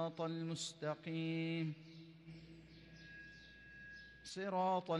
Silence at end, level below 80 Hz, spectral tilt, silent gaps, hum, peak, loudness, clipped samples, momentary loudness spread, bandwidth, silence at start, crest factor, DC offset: 0 s; -72 dBFS; -5.5 dB/octave; none; none; -28 dBFS; -43 LUFS; under 0.1%; 18 LU; 11.5 kHz; 0 s; 16 dB; under 0.1%